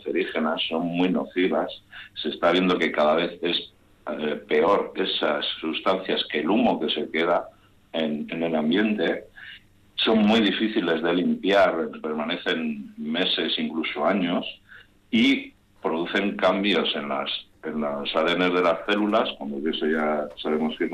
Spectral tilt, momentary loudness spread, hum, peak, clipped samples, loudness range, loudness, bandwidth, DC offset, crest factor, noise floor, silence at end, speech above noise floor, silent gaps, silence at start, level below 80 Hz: -6 dB/octave; 11 LU; none; -10 dBFS; under 0.1%; 2 LU; -24 LUFS; 9.6 kHz; under 0.1%; 14 dB; -51 dBFS; 0 s; 27 dB; none; 0 s; -60 dBFS